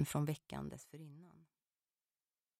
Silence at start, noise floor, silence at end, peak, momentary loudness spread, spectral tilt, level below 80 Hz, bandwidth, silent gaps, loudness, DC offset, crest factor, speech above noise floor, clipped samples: 0 s; under -90 dBFS; 1.15 s; -24 dBFS; 21 LU; -6 dB/octave; -70 dBFS; 16 kHz; none; -44 LUFS; under 0.1%; 22 dB; over 47 dB; under 0.1%